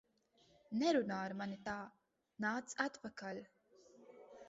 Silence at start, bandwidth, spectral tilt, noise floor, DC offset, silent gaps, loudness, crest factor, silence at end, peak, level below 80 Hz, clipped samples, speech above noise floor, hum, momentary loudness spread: 0.7 s; 7.6 kHz; -3.5 dB/octave; -74 dBFS; under 0.1%; none; -41 LUFS; 22 dB; 0 s; -22 dBFS; -78 dBFS; under 0.1%; 33 dB; none; 20 LU